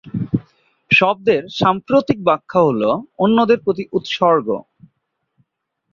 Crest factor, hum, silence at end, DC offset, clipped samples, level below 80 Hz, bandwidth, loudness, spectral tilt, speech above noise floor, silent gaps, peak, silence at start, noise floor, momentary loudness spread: 16 dB; none; 1.3 s; under 0.1%; under 0.1%; -54 dBFS; 7.2 kHz; -17 LUFS; -6.5 dB/octave; 57 dB; none; -2 dBFS; 0.05 s; -74 dBFS; 9 LU